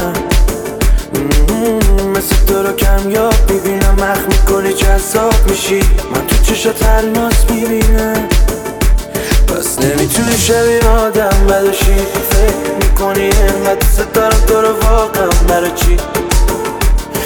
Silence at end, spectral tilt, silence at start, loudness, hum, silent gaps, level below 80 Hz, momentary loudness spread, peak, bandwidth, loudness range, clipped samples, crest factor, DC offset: 0 s; -4.5 dB/octave; 0 s; -12 LUFS; none; none; -12 dBFS; 4 LU; 0 dBFS; 20 kHz; 2 LU; under 0.1%; 10 dB; under 0.1%